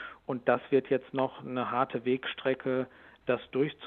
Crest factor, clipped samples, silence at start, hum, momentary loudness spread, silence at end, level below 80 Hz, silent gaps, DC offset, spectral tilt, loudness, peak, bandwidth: 22 dB; under 0.1%; 0 s; none; 7 LU; 0 s; -70 dBFS; none; under 0.1%; -9 dB/octave; -31 LUFS; -10 dBFS; 4.3 kHz